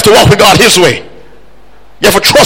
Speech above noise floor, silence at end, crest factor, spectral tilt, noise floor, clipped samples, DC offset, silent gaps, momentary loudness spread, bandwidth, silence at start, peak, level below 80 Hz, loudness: 36 dB; 0 s; 8 dB; -3.5 dB/octave; -41 dBFS; 3%; 3%; none; 7 LU; over 20 kHz; 0 s; 0 dBFS; -30 dBFS; -5 LUFS